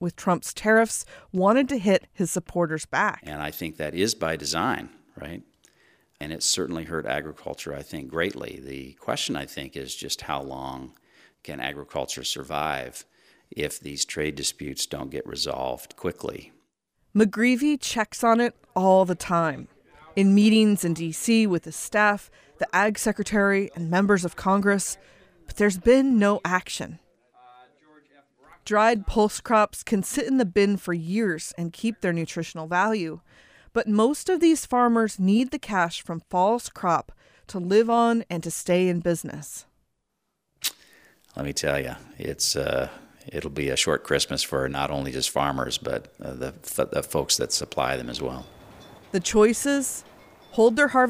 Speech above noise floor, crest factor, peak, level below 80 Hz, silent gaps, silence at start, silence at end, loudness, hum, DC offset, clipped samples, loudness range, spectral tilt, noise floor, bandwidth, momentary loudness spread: 54 dB; 20 dB; -6 dBFS; -50 dBFS; none; 0 s; 0 s; -24 LUFS; none; under 0.1%; under 0.1%; 9 LU; -4 dB/octave; -78 dBFS; 15.5 kHz; 15 LU